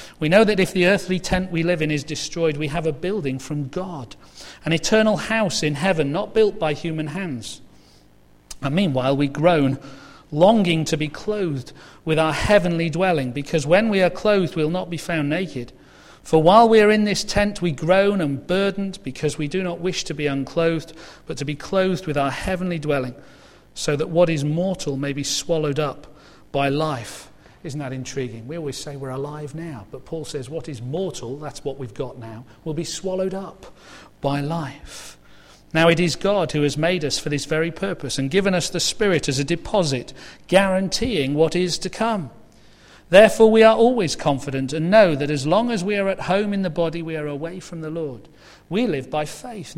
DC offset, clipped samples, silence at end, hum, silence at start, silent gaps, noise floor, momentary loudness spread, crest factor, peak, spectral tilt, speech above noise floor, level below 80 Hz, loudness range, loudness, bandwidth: under 0.1%; under 0.1%; 0 s; 50 Hz at -50 dBFS; 0 s; none; -52 dBFS; 16 LU; 20 dB; 0 dBFS; -5 dB/octave; 31 dB; -44 dBFS; 11 LU; -21 LUFS; 15.5 kHz